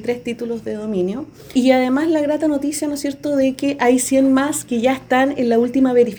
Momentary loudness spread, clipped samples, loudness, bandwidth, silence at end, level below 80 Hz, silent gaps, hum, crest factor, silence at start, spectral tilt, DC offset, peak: 9 LU; under 0.1%; -18 LUFS; over 20 kHz; 0 s; -54 dBFS; none; none; 16 dB; 0 s; -4.5 dB/octave; under 0.1%; -2 dBFS